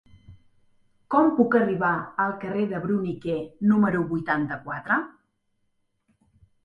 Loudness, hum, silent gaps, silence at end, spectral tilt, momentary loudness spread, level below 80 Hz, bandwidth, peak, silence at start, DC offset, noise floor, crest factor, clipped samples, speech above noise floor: -24 LUFS; none; none; 1.55 s; -9.5 dB/octave; 9 LU; -60 dBFS; 5.4 kHz; -6 dBFS; 0.3 s; under 0.1%; -72 dBFS; 20 dB; under 0.1%; 49 dB